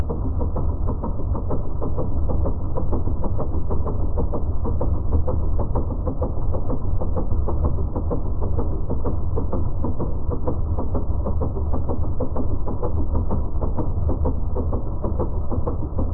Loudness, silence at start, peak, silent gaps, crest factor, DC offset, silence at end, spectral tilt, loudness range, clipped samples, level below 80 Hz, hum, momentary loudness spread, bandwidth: -26 LUFS; 0 s; -6 dBFS; none; 14 dB; under 0.1%; 0 s; -15 dB/octave; 1 LU; under 0.1%; -24 dBFS; none; 3 LU; 1.6 kHz